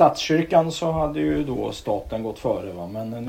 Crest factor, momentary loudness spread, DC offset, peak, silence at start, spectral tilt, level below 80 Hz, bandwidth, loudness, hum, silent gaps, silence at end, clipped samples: 18 dB; 11 LU; under 0.1%; -4 dBFS; 0 s; -6 dB/octave; -44 dBFS; 16.5 kHz; -24 LUFS; none; none; 0 s; under 0.1%